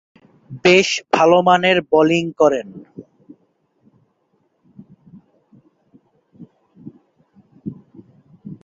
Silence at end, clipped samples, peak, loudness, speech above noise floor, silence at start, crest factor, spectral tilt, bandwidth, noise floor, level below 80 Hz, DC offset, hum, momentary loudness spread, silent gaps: 0.1 s; under 0.1%; -2 dBFS; -15 LUFS; 50 dB; 0.5 s; 20 dB; -4.5 dB/octave; 7.8 kHz; -65 dBFS; -62 dBFS; under 0.1%; none; 23 LU; none